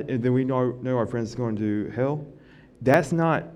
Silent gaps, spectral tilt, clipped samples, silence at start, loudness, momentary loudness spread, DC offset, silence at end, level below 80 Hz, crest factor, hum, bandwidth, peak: none; -8 dB/octave; under 0.1%; 0 s; -25 LUFS; 8 LU; under 0.1%; 0 s; -56 dBFS; 20 dB; none; 12.5 kHz; -6 dBFS